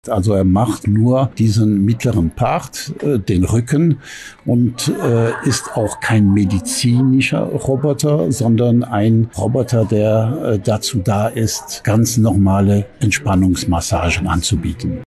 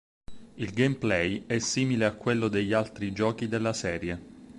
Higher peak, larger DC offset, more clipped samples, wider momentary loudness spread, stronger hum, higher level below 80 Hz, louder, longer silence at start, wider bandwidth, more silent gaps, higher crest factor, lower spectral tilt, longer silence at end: first, -6 dBFS vs -10 dBFS; neither; neither; second, 5 LU vs 8 LU; neither; first, -32 dBFS vs -54 dBFS; first, -16 LUFS vs -28 LUFS; second, 0.05 s vs 0.3 s; about the same, 12.5 kHz vs 11.5 kHz; neither; second, 8 dB vs 18 dB; about the same, -6 dB/octave vs -5 dB/octave; about the same, 0 s vs 0 s